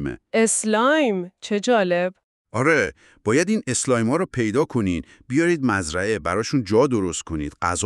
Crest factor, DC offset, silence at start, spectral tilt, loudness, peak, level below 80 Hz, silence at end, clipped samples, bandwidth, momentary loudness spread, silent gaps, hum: 16 dB; under 0.1%; 0 s; -4.5 dB/octave; -21 LUFS; -6 dBFS; -48 dBFS; 0 s; under 0.1%; 12.5 kHz; 9 LU; 2.24-2.45 s; none